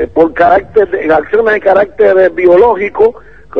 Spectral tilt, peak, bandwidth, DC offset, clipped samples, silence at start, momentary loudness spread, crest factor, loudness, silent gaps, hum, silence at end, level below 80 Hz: -7.5 dB/octave; 0 dBFS; 6 kHz; 1%; 1%; 0 s; 5 LU; 8 dB; -9 LUFS; none; none; 0 s; -38 dBFS